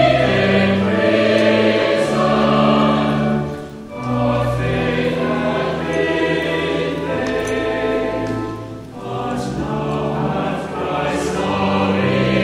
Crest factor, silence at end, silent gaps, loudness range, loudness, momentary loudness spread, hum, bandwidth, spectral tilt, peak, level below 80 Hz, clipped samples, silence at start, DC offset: 16 dB; 0 s; none; 7 LU; -18 LUFS; 9 LU; none; 12.5 kHz; -6.5 dB/octave; -2 dBFS; -40 dBFS; under 0.1%; 0 s; under 0.1%